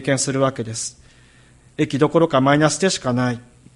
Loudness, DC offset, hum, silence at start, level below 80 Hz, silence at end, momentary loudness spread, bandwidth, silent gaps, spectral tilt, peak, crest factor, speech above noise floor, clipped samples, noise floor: -19 LUFS; under 0.1%; none; 0 s; -54 dBFS; 0.35 s; 12 LU; 11.5 kHz; none; -4.5 dB/octave; -2 dBFS; 18 dB; 32 dB; under 0.1%; -50 dBFS